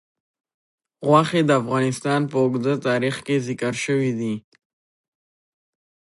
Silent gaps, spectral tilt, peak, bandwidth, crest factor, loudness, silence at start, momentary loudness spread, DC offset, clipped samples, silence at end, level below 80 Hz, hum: none; -6 dB/octave; -2 dBFS; 11.5 kHz; 20 dB; -21 LUFS; 1 s; 8 LU; under 0.1%; under 0.1%; 1.65 s; -66 dBFS; none